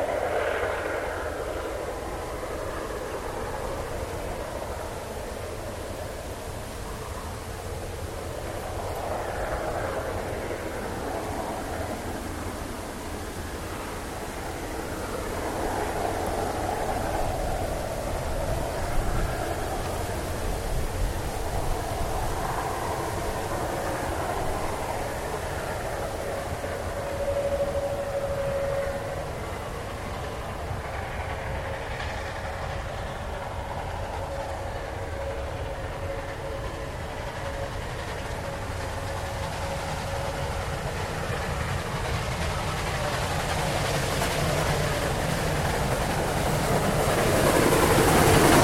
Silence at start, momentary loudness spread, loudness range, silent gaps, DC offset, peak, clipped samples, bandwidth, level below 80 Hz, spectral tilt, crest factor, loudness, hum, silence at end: 0 s; 9 LU; 7 LU; none; under 0.1%; -4 dBFS; under 0.1%; 16.5 kHz; -38 dBFS; -4.5 dB/octave; 24 dB; -29 LUFS; none; 0 s